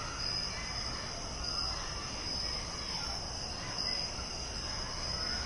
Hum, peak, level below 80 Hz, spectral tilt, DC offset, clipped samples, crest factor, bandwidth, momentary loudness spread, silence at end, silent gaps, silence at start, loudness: none; -24 dBFS; -46 dBFS; -2 dB/octave; under 0.1%; under 0.1%; 14 dB; 11.5 kHz; 4 LU; 0 s; none; 0 s; -36 LUFS